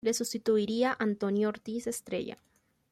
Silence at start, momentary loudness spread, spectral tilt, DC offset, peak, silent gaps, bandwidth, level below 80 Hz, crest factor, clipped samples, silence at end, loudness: 0.05 s; 8 LU; -4.5 dB/octave; under 0.1%; -16 dBFS; none; 16 kHz; -72 dBFS; 16 dB; under 0.1%; 0.6 s; -31 LUFS